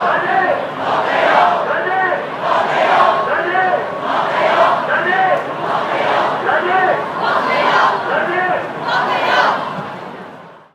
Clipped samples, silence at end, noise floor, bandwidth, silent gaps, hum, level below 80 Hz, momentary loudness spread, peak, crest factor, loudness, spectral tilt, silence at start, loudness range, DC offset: under 0.1%; 0.15 s; -36 dBFS; 12.5 kHz; none; none; -66 dBFS; 7 LU; 0 dBFS; 16 dB; -15 LUFS; -4.5 dB/octave; 0 s; 1 LU; under 0.1%